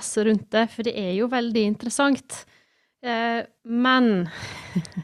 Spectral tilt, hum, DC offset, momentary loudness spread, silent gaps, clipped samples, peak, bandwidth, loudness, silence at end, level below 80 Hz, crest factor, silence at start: -4.5 dB/octave; none; under 0.1%; 12 LU; none; under 0.1%; -6 dBFS; 13.5 kHz; -23 LUFS; 0 s; -62 dBFS; 18 dB; 0 s